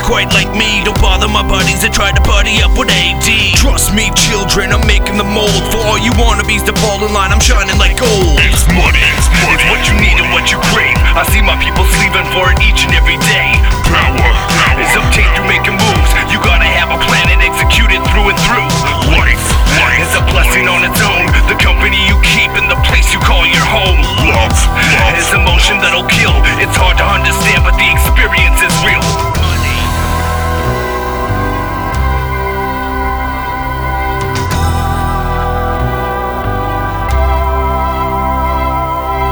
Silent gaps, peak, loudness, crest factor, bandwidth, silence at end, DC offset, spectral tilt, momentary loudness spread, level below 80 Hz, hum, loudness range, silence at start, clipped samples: none; 0 dBFS; -10 LUFS; 10 dB; over 20 kHz; 0 s; under 0.1%; -3.5 dB/octave; 7 LU; -14 dBFS; none; 6 LU; 0 s; under 0.1%